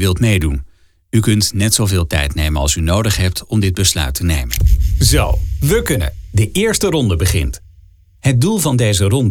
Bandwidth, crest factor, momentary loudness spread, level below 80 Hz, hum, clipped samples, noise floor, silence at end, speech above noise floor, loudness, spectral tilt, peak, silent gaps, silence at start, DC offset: 18 kHz; 14 dB; 6 LU; -22 dBFS; none; under 0.1%; -45 dBFS; 0 s; 31 dB; -15 LUFS; -4.5 dB/octave; 0 dBFS; none; 0 s; under 0.1%